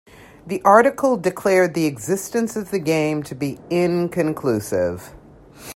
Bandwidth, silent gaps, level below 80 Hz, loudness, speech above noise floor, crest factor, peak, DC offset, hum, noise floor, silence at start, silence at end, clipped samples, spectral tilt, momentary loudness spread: 16.5 kHz; none; -56 dBFS; -20 LUFS; 23 dB; 20 dB; 0 dBFS; under 0.1%; none; -42 dBFS; 0.45 s; 0.05 s; under 0.1%; -5.5 dB/octave; 12 LU